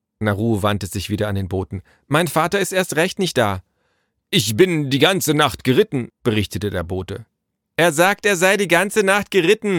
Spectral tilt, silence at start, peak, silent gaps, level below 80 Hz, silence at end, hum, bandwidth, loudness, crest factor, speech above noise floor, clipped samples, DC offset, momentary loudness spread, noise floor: -4.5 dB/octave; 0.2 s; -2 dBFS; none; -48 dBFS; 0 s; none; 19 kHz; -18 LUFS; 18 dB; 50 dB; under 0.1%; under 0.1%; 10 LU; -68 dBFS